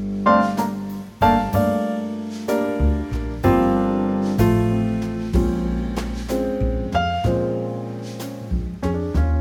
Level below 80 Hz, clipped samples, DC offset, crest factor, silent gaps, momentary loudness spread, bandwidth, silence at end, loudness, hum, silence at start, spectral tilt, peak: -28 dBFS; under 0.1%; under 0.1%; 16 dB; none; 10 LU; 17.5 kHz; 0 s; -21 LUFS; none; 0 s; -7.5 dB/octave; -4 dBFS